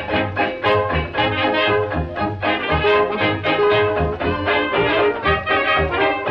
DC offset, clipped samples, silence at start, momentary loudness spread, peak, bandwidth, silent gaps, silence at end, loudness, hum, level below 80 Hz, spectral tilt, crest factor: under 0.1%; under 0.1%; 0 s; 5 LU; -6 dBFS; 6 kHz; none; 0 s; -18 LUFS; none; -36 dBFS; -7.5 dB/octave; 12 dB